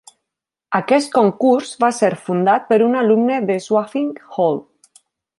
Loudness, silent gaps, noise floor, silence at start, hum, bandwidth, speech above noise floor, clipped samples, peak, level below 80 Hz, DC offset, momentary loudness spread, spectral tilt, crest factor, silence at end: -17 LUFS; none; -83 dBFS; 0.7 s; none; 11.5 kHz; 66 dB; under 0.1%; -2 dBFS; -68 dBFS; under 0.1%; 8 LU; -6 dB/octave; 16 dB; 0.8 s